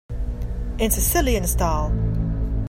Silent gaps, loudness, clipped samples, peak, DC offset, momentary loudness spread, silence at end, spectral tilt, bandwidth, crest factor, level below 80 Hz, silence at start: none; -23 LUFS; under 0.1%; -4 dBFS; under 0.1%; 11 LU; 0 s; -5 dB/octave; 16.5 kHz; 16 dB; -24 dBFS; 0.1 s